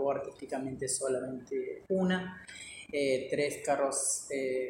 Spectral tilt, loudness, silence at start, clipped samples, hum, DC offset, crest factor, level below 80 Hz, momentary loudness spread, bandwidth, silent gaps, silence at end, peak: -4 dB/octave; -33 LUFS; 0 s; under 0.1%; none; under 0.1%; 16 dB; -68 dBFS; 9 LU; 16.5 kHz; none; 0 s; -16 dBFS